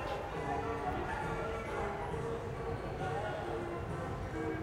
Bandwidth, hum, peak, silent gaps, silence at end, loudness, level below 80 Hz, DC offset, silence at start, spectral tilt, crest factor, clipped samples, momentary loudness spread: 16.5 kHz; none; -26 dBFS; none; 0 s; -39 LUFS; -50 dBFS; under 0.1%; 0 s; -6.5 dB/octave; 12 dB; under 0.1%; 3 LU